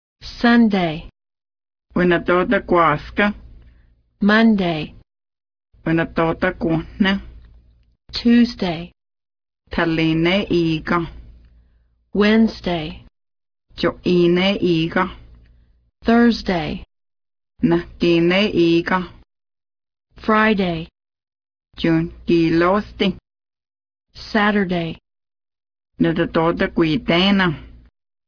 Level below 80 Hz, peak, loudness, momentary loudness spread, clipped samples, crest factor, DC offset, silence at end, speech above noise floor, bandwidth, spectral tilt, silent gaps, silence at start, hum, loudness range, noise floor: -42 dBFS; -4 dBFS; -18 LUFS; 13 LU; under 0.1%; 16 dB; under 0.1%; 0.6 s; 41 dB; 5.4 kHz; -7 dB/octave; none; 0.25 s; none; 4 LU; -58 dBFS